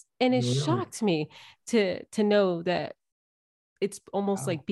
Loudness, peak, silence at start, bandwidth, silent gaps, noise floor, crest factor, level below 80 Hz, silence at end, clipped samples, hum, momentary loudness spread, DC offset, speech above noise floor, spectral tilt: -27 LUFS; -12 dBFS; 0.2 s; 12.5 kHz; 3.12-3.76 s; under -90 dBFS; 16 dB; -72 dBFS; 0 s; under 0.1%; none; 9 LU; under 0.1%; over 63 dB; -5.5 dB/octave